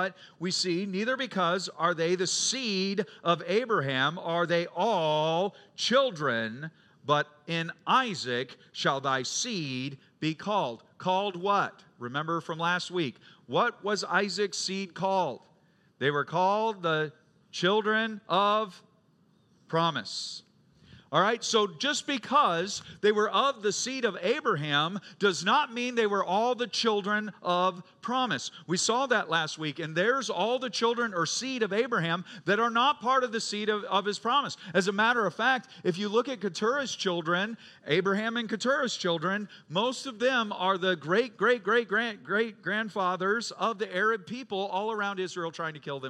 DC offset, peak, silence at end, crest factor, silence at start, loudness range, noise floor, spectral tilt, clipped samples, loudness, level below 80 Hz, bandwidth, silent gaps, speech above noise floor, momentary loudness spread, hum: under 0.1%; -10 dBFS; 0 s; 20 dB; 0 s; 3 LU; -65 dBFS; -3.5 dB/octave; under 0.1%; -28 LUFS; -82 dBFS; 12 kHz; none; 36 dB; 8 LU; none